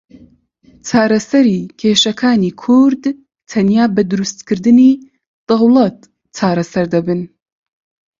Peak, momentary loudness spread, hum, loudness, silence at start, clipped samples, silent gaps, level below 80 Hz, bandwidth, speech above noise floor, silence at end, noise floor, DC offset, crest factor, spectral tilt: 0 dBFS; 11 LU; none; -13 LUFS; 0.85 s; under 0.1%; 5.27-5.47 s; -54 dBFS; 7.6 kHz; 37 dB; 0.95 s; -49 dBFS; under 0.1%; 14 dB; -5.5 dB/octave